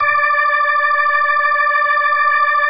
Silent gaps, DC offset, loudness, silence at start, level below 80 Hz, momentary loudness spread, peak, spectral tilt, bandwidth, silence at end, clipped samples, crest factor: none; under 0.1%; -13 LUFS; 0 s; -58 dBFS; 1 LU; -4 dBFS; -4.5 dB/octave; 5 kHz; 0 s; under 0.1%; 10 dB